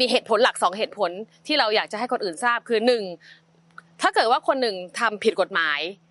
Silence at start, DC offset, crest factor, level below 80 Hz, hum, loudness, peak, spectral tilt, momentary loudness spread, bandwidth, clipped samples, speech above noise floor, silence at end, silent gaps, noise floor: 0 s; under 0.1%; 18 dB; -82 dBFS; none; -22 LUFS; -4 dBFS; -2.5 dB/octave; 7 LU; 11.5 kHz; under 0.1%; 27 dB; 0.15 s; none; -50 dBFS